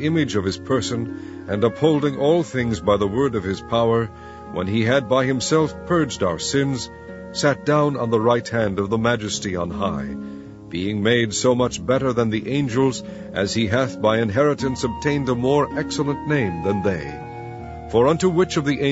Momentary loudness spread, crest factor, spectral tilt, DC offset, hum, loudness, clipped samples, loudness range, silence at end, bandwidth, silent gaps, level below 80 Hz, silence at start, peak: 12 LU; 18 dB; -5.5 dB/octave; under 0.1%; none; -21 LUFS; under 0.1%; 1 LU; 0 s; 8 kHz; none; -46 dBFS; 0 s; -4 dBFS